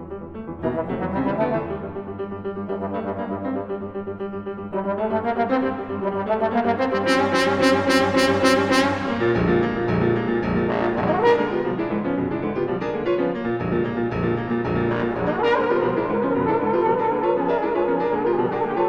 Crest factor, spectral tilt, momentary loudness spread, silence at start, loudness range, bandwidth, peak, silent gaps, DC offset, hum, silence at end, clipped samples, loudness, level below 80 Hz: 16 dB; -6 dB/octave; 11 LU; 0 s; 8 LU; 16 kHz; -4 dBFS; none; under 0.1%; none; 0 s; under 0.1%; -22 LUFS; -46 dBFS